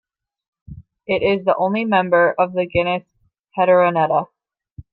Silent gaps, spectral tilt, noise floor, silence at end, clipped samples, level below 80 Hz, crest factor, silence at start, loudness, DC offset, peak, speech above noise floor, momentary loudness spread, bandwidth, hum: 4.72-4.76 s; -9.5 dB/octave; -43 dBFS; 0.1 s; under 0.1%; -50 dBFS; 16 dB; 0.7 s; -18 LUFS; under 0.1%; -2 dBFS; 26 dB; 11 LU; 4.9 kHz; none